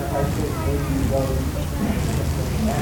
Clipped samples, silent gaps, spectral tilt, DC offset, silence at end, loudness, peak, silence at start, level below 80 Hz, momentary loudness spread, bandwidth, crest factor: under 0.1%; none; -6.5 dB/octave; under 0.1%; 0 s; -23 LUFS; -10 dBFS; 0 s; -28 dBFS; 2 LU; 19 kHz; 12 dB